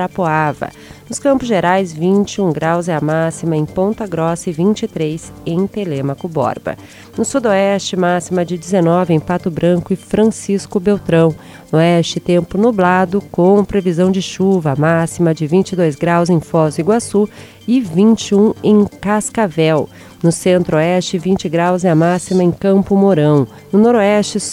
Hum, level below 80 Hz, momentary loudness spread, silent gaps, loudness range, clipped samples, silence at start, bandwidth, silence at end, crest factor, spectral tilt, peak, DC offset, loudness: none; -46 dBFS; 7 LU; none; 4 LU; under 0.1%; 0 s; 14 kHz; 0 s; 12 dB; -6.5 dB/octave; -2 dBFS; under 0.1%; -14 LUFS